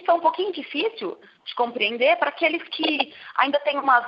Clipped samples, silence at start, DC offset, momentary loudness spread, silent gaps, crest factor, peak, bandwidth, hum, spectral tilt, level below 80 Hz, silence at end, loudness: under 0.1%; 0 s; under 0.1%; 10 LU; none; 18 dB; -4 dBFS; 5.6 kHz; none; -6 dB/octave; -82 dBFS; 0 s; -23 LUFS